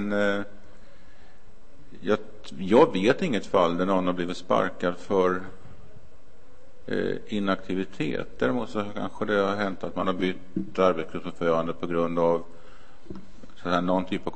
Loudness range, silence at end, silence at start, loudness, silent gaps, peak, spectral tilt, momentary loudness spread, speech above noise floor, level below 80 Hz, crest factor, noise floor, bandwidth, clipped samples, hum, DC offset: 6 LU; 0 s; 0 s; -26 LUFS; none; -6 dBFS; -6.5 dB/octave; 12 LU; 29 dB; -54 dBFS; 22 dB; -55 dBFS; 8.8 kHz; under 0.1%; none; 2%